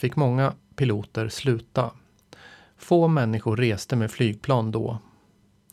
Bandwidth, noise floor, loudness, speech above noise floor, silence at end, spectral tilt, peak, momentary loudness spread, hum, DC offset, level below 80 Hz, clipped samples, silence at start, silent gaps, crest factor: 13.5 kHz; -61 dBFS; -24 LUFS; 37 dB; 0.75 s; -7 dB/octave; -8 dBFS; 8 LU; none; under 0.1%; -58 dBFS; under 0.1%; 0 s; none; 18 dB